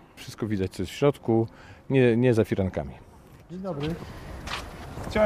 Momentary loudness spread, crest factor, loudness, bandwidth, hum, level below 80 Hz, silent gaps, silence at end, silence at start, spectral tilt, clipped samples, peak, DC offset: 18 LU; 18 dB; -27 LUFS; 15.5 kHz; none; -46 dBFS; none; 0 s; 0.15 s; -7 dB/octave; under 0.1%; -8 dBFS; under 0.1%